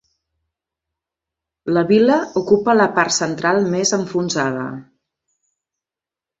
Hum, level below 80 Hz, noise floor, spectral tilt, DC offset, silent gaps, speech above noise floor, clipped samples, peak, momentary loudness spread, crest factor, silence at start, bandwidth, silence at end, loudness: none; -60 dBFS; -88 dBFS; -4 dB/octave; under 0.1%; none; 72 dB; under 0.1%; -2 dBFS; 11 LU; 18 dB; 1.65 s; 8 kHz; 1.6 s; -17 LUFS